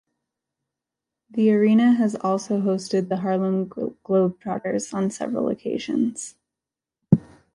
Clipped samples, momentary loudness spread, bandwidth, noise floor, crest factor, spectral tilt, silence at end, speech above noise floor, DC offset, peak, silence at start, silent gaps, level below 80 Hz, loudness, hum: under 0.1%; 11 LU; 11 kHz; -88 dBFS; 22 dB; -7 dB/octave; 0.35 s; 66 dB; under 0.1%; -2 dBFS; 1.35 s; none; -62 dBFS; -23 LUFS; none